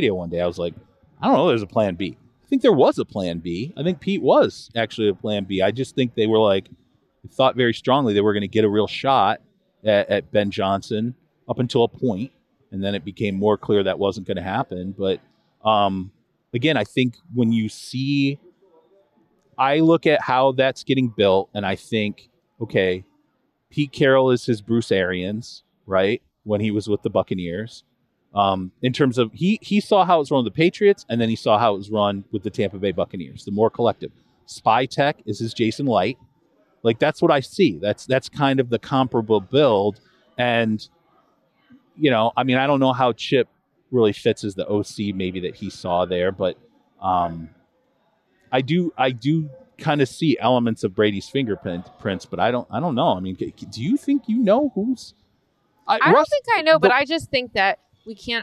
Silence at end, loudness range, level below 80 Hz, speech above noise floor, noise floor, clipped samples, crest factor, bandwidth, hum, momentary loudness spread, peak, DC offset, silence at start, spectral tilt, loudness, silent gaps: 0 s; 4 LU; -60 dBFS; 48 dB; -68 dBFS; under 0.1%; 20 dB; 12 kHz; none; 12 LU; 0 dBFS; under 0.1%; 0 s; -6.5 dB/octave; -21 LUFS; none